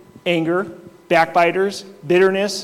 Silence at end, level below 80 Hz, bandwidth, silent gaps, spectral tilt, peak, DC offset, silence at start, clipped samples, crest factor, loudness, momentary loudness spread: 0 s; -64 dBFS; 14.5 kHz; none; -5 dB/octave; -4 dBFS; under 0.1%; 0.25 s; under 0.1%; 14 dB; -18 LUFS; 8 LU